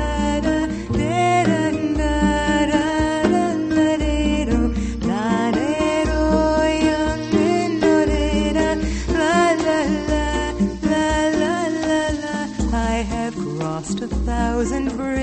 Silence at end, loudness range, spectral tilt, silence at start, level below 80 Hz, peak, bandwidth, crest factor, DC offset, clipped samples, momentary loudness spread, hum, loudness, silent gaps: 0 s; 3 LU; -5.5 dB/octave; 0 s; -28 dBFS; -4 dBFS; 8.8 kHz; 16 dB; under 0.1%; under 0.1%; 6 LU; none; -20 LUFS; none